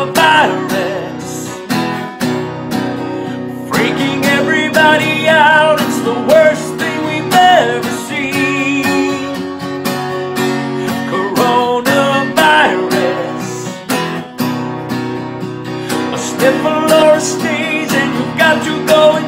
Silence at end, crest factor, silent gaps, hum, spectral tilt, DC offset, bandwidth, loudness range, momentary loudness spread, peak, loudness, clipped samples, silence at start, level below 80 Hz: 0 s; 14 dB; none; none; -4 dB/octave; under 0.1%; 16.5 kHz; 7 LU; 12 LU; 0 dBFS; -13 LUFS; under 0.1%; 0 s; -54 dBFS